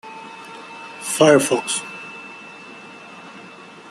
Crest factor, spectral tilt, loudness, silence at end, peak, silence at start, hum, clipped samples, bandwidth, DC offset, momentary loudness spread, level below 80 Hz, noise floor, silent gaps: 22 dB; -3.5 dB/octave; -17 LUFS; 0.4 s; -2 dBFS; 0.05 s; none; under 0.1%; 13.5 kHz; under 0.1%; 25 LU; -68 dBFS; -41 dBFS; none